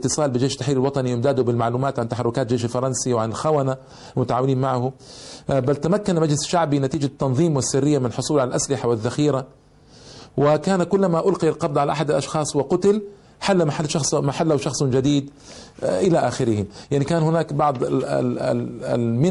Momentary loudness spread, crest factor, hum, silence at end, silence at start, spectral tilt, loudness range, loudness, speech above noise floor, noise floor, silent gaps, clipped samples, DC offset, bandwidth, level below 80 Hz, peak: 6 LU; 12 dB; none; 0 s; 0 s; -6 dB/octave; 2 LU; -21 LUFS; 27 dB; -47 dBFS; none; under 0.1%; under 0.1%; 11.5 kHz; -52 dBFS; -8 dBFS